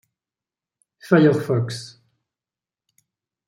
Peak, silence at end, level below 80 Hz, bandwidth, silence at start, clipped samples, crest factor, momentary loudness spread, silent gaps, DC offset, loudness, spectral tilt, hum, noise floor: -4 dBFS; 1.6 s; -68 dBFS; 16 kHz; 1.05 s; under 0.1%; 20 dB; 18 LU; none; under 0.1%; -19 LUFS; -7 dB/octave; none; under -90 dBFS